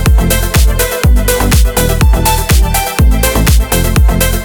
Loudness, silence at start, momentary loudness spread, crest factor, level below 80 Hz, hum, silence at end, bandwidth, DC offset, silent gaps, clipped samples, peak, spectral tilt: -10 LUFS; 0 s; 2 LU; 8 dB; -10 dBFS; none; 0 s; over 20 kHz; under 0.1%; none; under 0.1%; 0 dBFS; -4.5 dB/octave